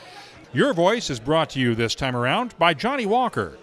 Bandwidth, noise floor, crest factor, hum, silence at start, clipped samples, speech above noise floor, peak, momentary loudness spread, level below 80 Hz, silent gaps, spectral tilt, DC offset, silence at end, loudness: 13.5 kHz; -44 dBFS; 18 dB; none; 0 s; under 0.1%; 22 dB; -4 dBFS; 5 LU; -50 dBFS; none; -5 dB/octave; under 0.1%; 0.05 s; -22 LUFS